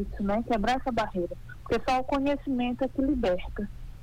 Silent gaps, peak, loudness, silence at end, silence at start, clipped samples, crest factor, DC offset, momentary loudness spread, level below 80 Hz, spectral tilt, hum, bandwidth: none; -16 dBFS; -29 LUFS; 0 s; 0 s; under 0.1%; 12 dB; under 0.1%; 10 LU; -42 dBFS; -6.5 dB/octave; none; 15 kHz